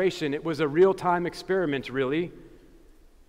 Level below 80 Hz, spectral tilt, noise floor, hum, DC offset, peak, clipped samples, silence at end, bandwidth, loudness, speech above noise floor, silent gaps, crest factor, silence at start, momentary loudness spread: -56 dBFS; -6.5 dB/octave; -53 dBFS; none; under 0.1%; -10 dBFS; under 0.1%; 0.8 s; 12.5 kHz; -26 LUFS; 28 dB; none; 16 dB; 0 s; 8 LU